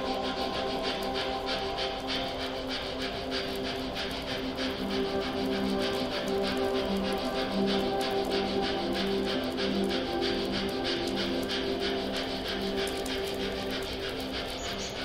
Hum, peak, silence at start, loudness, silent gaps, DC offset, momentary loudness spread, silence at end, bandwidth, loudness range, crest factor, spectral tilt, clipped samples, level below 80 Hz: none; -16 dBFS; 0 s; -31 LUFS; none; under 0.1%; 4 LU; 0 s; 16 kHz; 3 LU; 16 dB; -4.5 dB/octave; under 0.1%; -48 dBFS